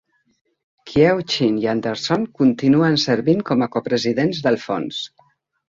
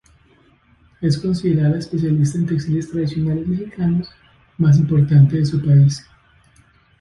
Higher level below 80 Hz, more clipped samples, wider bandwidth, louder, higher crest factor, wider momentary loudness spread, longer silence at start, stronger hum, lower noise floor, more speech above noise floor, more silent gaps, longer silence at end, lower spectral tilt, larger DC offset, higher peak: second, -54 dBFS vs -46 dBFS; neither; second, 7.8 kHz vs 10.5 kHz; about the same, -19 LUFS vs -17 LUFS; about the same, 18 dB vs 16 dB; about the same, 8 LU vs 9 LU; second, 0.85 s vs 1 s; neither; first, -59 dBFS vs -54 dBFS; about the same, 41 dB vs 38 dB; neither; second, 0.6 s vs 1 s; second, -6 dB/octave vs -8 dB/octave; neither; about the same, -2 dBFS vs -2 dBFS